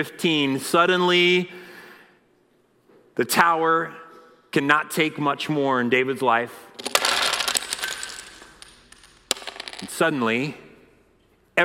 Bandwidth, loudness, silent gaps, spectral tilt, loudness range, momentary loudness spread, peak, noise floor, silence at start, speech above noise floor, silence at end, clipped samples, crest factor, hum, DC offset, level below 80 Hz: 16.5 kHz; -21 LUFS; none; -3 dB/octave; 6 LU; 16 LU; -4 dBFS; -62 dBFS; 0 s; 40 dB; 0 s; under 0.1%; 20 dB; none; under 0.1%; -64 dBFS